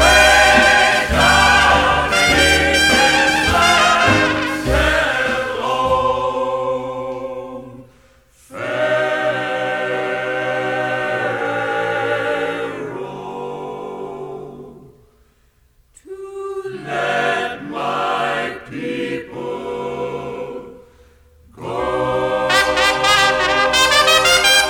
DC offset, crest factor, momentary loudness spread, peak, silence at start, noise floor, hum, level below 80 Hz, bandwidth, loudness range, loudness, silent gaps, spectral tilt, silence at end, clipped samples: under 0.1%; 16 dB; 18 LU; 0 dBFS; 0 s; -56 dBFS; none; -34 dBFS; over 20 kHz; 15 LU; -15 LUFS; none; -2.5 dB/octave; 0 s; under 0.1%